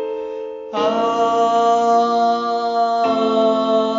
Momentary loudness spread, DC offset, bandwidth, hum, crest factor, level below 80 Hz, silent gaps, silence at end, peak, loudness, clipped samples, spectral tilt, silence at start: 11 LU; under 0.1%; 7.6 kHz; none; 12 dB; -62 dBFS; none; 0 s; -4 dBFS; -17 LUFS; under 0.1%; -3 dB/octave; 0 s